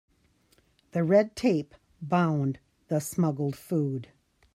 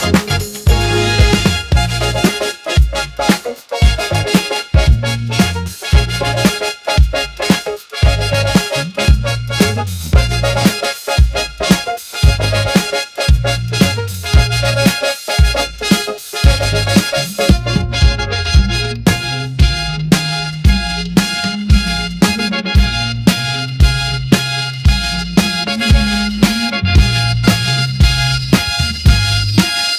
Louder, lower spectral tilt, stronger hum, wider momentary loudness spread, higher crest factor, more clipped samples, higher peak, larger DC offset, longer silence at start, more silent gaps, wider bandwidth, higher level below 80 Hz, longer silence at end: second, -28 LUFS vs -14 LUFS; first, -7 dB/octave vs -4.5 dB/octave; neither; first, 14 LU vs 4 LU; about the same, 18 dB vs 14 dB; second, under 0.1% vs 0.2%; second, -10 dBFS vs 0 dBFS; neither; first, 0.95 s vs 0 s; neither; about the same, 15.5 kHz vs 16 kHz; second, -66 dBFS vs -18 dBFS; first, 0.5 s vs 0 s